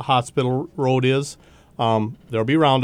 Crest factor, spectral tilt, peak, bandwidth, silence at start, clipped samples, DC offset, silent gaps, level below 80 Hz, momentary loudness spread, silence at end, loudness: 16 dB; -6 dB/octave; -4 dBFS; 11.5 kHz; 0 s; under 0.1%; under 0.1%; none; -56 dBFS; 8 LU; 0 s; -21 LUFS